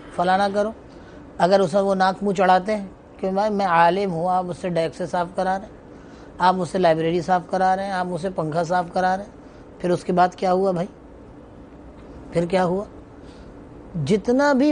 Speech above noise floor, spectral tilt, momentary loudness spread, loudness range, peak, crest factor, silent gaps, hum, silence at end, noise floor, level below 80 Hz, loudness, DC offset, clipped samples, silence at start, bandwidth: 22 dB; -6.5 dB/octave; 21 LU; 5 LU; -4 dBFS; 18 dB; none; none; 0 s; -43 dBFS; -50 dBFS; -21 LUFS; under 0.1%; under 0.1%; 0 s; 10 kHz